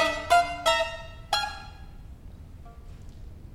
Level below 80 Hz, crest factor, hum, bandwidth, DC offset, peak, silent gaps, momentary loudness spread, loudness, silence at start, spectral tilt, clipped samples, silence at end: -46 dBFS; 20 dB; none; 16.5 kHz; under 0.1%; -8 dBFS; none; 25 LU; -25 LUFS; 0 s; -2.5 dB/octave; under 0.1%; 0 s